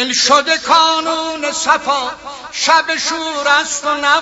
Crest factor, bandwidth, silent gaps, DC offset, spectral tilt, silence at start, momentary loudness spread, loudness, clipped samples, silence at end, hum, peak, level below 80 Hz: 14 dB; 11 kHz; none; under 0.1%; 0.5 dB/octave; 0 s; 8 LU; -14 LUFS; under 0.1%; 0 s; none; 0 dBFS; -54 dBFS